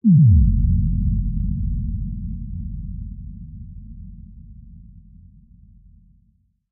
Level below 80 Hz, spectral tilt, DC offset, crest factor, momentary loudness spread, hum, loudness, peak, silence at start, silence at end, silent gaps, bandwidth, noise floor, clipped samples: -26 dBFS; -28 dB/octave; under 0.1%; 16 dB; 26 LU; none; -21 LUFS; -6 dBFS; 0.05 s; 1.9 s; none; 0.4 kHz; -62 dBFS; under 0.1%